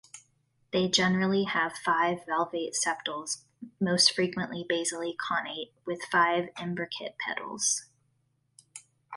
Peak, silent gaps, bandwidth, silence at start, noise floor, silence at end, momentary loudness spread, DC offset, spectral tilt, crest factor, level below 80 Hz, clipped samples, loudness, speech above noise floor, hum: -6 dBFS; none; 11.5 kHz; 0.15 s; -73 dBFS; 0 s; 13 LU; under 0.1%; -3 dB/octave; 24 dB; -70 dBFS; under 0.1%; -28 LUFS; 44 dB; none